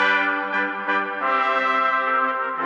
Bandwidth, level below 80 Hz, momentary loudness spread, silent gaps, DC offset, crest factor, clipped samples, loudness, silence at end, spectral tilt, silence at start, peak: 8.4 kHz; -84 dBFS; 4 LU; none; under 0.1%; 14 dB; under 0.1%; -21 LUFS; 0 s; -4 dB/octave; 0 s; -6 dBFS